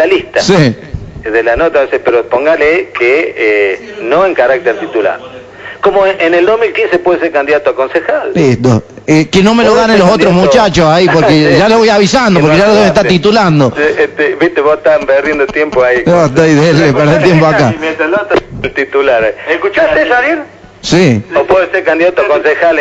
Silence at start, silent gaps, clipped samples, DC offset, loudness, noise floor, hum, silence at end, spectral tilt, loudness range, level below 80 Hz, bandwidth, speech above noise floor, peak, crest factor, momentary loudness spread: 0 s; none; 1%; under 0.1%; -8 LUFS; -28 dBFS; none; 0 s; -5.5 dB/octave; 4 LU; -36 dBFS; 9.6 kHz; 20 dB; 0 dBFS; 8 dB; 7 LU